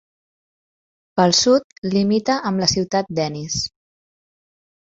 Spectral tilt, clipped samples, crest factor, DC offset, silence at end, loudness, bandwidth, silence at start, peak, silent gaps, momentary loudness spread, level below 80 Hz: -4 dB/octave; under 0.1%; 20 dB; under 0.1%; 1.2 s; -19 LUFS; 8 kHz; 1.15 s; -2 dBFS; 1.64-1.70 s, 1.78-1.82 s; 9 LU; -52 dBFS